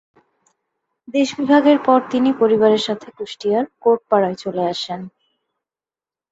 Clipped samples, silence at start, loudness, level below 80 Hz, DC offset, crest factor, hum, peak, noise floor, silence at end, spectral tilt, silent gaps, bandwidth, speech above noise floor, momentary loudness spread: under 0.1%; 1.1 s; -17 LUFS; -64 dBFS; under 0.1%; 18 dB; none; -2 dBFS; under -90 dBFS; 1.25 s; -5.5 dB/octave; none; 8 kHz; over 73 dB; 13 LU